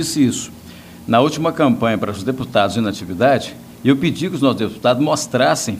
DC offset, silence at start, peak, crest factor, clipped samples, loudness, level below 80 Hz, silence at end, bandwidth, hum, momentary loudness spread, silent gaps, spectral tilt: under 0.1%; 0 s; 0 dBFS; 18 dB; under 0.1%; -17 LUFS; -54 dBFS; 0 s; 16 kHz; none; 9 LU; none; -5 dB/octave